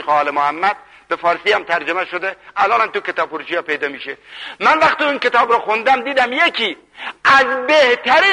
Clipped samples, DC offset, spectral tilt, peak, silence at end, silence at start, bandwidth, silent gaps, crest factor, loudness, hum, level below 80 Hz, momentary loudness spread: under 0.1%; under 0.1%; -2.5 dB/octave; -2 dBFS; 0 s; 0 s; 11 kHz; none; 14 dB; -15 LUFS; none; -58 dBFS; 12 LU